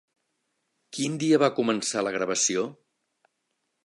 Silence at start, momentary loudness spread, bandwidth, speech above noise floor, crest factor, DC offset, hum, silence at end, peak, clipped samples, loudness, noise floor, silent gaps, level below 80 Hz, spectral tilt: 0.95 s; 10 LU; 11.5 kHz; 53 dB; 20 dB; under 0.1%; none; 1.1 s; -8 dBFS; under 0.1%; -25 LUFS; -78 dBFS; none; -76 dBFS; -3.5 dB/octave